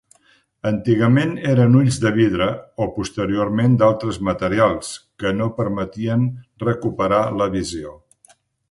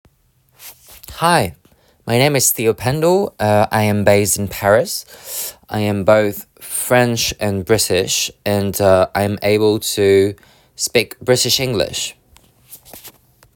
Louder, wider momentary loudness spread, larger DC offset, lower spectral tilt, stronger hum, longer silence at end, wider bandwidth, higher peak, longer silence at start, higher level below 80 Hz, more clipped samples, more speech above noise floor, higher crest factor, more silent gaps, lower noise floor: second, -19 LUFS vs -16 LUFS; about the same, 10 LU vs 11 LU; neither; first, -7 dB/octave vs -4 dB/octave; neither; first, 0.75 s vs 0.45 s; second, 11.5 kHz vs 19 kHz; about the same, -2 dBFS vs 0 dBFS; about the same, 0.65 s vs 0.6 s; about the same, -46 dBFS vs -46 dBFS; neither; about the same, 40 dB vs 42 dB; about the same, 16 dB vs 16 dB; neither; about the same, -58 dBFS vs -58 dBFS